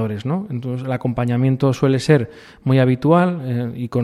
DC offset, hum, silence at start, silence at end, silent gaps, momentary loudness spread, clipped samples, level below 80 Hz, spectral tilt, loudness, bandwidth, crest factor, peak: under 0.1%; none; 0 s; 0 s; none; 9 LU; under 0.1%; -52 dBFS; -8 dB/octave; -19 LUFS; 11.5 kHz; 16 dB; -2 dBFS